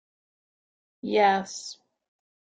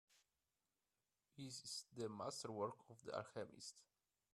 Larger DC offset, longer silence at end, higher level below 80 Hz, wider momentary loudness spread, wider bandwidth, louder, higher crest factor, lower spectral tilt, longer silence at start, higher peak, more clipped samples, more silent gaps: neither; first, 0.85 s vs 0.5 s; first, -76 dBFS vs -90 dBFS; first, 17 LU vs 10 LU; second, 9.2 kHz vs 14.5 kHz; first, -24 LUFS vs -51 LUFS; about the same, 20 dB vs 22 dB; about the same, -3.5 dB/octave vs -4 dB/octave; first, 1.05 s vs 0.1 s; first, -10 dBFS vs -30 dBFS; neither; neither